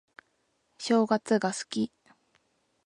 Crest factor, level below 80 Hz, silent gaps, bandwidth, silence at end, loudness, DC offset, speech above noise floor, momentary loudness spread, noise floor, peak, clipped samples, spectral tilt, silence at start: 20 dB; -72 dBFS; none; 11 kHz; 1 s; -28 LUFS; under 0.1%; 47 dB; 10 LU; -74 dBFS; -10 dBFS; under 0.1%; -4.5 dB/octave; 0.8 s